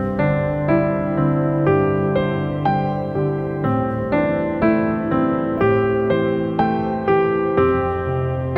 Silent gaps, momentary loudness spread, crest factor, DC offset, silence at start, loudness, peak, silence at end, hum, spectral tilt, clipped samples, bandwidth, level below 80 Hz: none; 4 LU; 14 dB; under 0.1%; 0 s; -19 LUFS; -4 dBFS; 0 s; none; -10.5 dB/octave; under 0.1%; 5.2 kHz; -42 dBFS